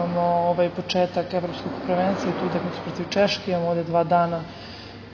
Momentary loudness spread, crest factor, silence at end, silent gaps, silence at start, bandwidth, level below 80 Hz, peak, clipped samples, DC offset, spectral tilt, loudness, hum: 10 LU; 16 dB; 0 s; none; 0 s; 7 kHz; -54 dBFS; -8 dBFS; under 0.1%; under 0.1%; -6.5 dB/octave; -24 LUFS; none